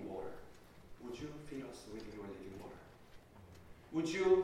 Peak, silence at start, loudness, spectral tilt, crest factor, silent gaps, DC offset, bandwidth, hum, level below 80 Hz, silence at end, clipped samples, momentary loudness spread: -20 dBFS; 0 s; -43 LUFS; -5.5 dB/octave; 22 dB; none; under 0.1%; 13 kHz; none; -64 dBFS; 0 s; under 0.1%; 22 LU